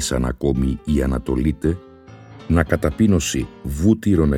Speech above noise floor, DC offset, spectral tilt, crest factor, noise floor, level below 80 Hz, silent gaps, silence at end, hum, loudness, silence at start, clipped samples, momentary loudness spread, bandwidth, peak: 23 dB; under 0.1%; -6 dB/octave; 18 dB; -42 dBFS; -28 dBFS; none; 0 s; none; -20 LUFS; 0 s; under 0.1%; 8 LU; 17 kHz; -2 dBFS